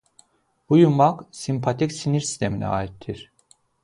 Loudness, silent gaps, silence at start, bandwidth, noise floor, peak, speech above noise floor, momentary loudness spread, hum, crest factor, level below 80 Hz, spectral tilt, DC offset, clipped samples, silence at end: -22 LUFS; none; 0.7 s; 11.5 kHz; -64 dBFS; -4 dBFS; 43 dB; 17 LU; none; 18 dB; -50 dBFS; -6.5 dB/octave; under 0.1%; under 0.1%; 0.6 s